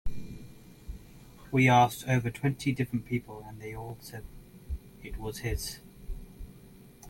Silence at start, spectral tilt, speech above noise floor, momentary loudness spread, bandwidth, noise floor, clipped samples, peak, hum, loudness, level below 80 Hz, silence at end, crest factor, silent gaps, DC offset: 0.05 s; -6 dB/octave; 23 dB; 25 LU; 17 kHz; -53 dBFS; under 0.1%; -10 dBFS; none; -29 LUFS; -46 dBFS; 0 s; 20 dB; none; under 0.1%